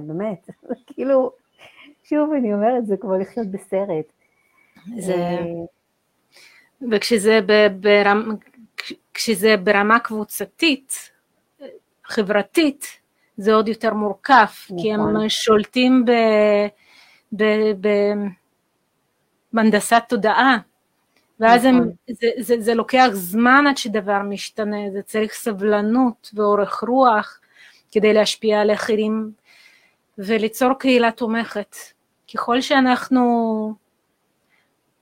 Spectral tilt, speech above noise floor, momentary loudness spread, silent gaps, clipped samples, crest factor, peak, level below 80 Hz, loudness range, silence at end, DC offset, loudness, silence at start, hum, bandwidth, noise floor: -4.5 dB/octave; 50 dB; 15 LU; none; under 0.1%; 18 dB; 0 dBFS; -62 dBFS; 6 LU; 1.25 s; under 0.1%; -18 LUFS; 0 s; none; 16 kHz; -69 dBFS